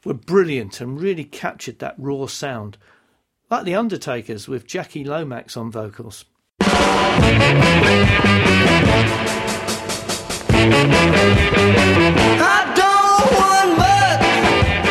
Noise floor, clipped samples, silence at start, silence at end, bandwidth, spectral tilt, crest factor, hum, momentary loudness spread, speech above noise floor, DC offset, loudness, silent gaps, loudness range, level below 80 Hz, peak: -65 dBFS; under 0.1%; 0.05 s; 0 s; 14.5 kHz; -5 dB/octave; 14 dB; none; 16 LU; 48 dB; under 0.1%; -15 LUFS; none; 13 LU; -34 dBFS; -2 dBFS